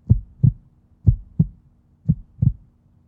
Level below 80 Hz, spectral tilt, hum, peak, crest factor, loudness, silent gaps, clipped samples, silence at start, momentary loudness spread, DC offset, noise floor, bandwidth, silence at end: -32 dBFS; -15 dB/octave; none; -2 dBFS; 20 dB; -22 LUFS; none; under 0.1%; 0.1 s; 8 LU; under 0.1%; -55 dBFS; 1 kHz; 0.55 s